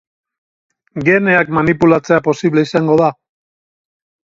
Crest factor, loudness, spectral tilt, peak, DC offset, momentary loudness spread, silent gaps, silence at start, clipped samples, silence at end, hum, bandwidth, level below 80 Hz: 16 dB; -13 LUFS; -7 dB/octave; 0 dBFS; under 0.1%; 5 LU; none; 0.95 s; under 0.1%; 1.2 s; none; 7.6 kHz; -50 dBFS